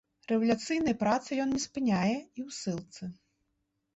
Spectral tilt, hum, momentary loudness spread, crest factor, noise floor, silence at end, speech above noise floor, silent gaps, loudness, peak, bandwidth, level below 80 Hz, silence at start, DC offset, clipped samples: -5 dB/octave; none; 13 LU; 16 dB; -80 dBFS; 0.8 s; 50 dB; none; -31 LUFS; -16 dBFS; 8.2 kHz; -64 dBFS; 0.3 s; under 0.1%; under 0.1%